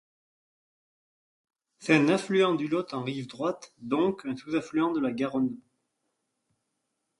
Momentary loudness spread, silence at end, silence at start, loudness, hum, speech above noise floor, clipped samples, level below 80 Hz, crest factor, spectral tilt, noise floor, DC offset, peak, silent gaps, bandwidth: 12 LU; 1.6 s; 1.8 s; -28 LUFS; none; 53 dB; under 0.1%; -72 dBFS; 24 dB; -6 dB/octave; -81 dBFS; under 0.1%; -6 dBFS; none; 11.5 kHz